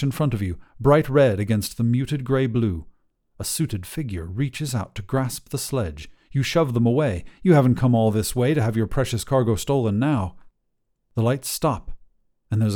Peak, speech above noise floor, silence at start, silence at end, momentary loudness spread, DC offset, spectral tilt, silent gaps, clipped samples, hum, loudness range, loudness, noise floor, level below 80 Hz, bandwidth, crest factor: -4 dBFS; 50 dB; 0 s; 0 s; 11 LU; under 0.1%; -6.5 dB/octave; none; under 0.1%; none; 6 LU; -22 LUFS; -71 dBFS; -42 dBFS; 18.5 kHz; 18 dB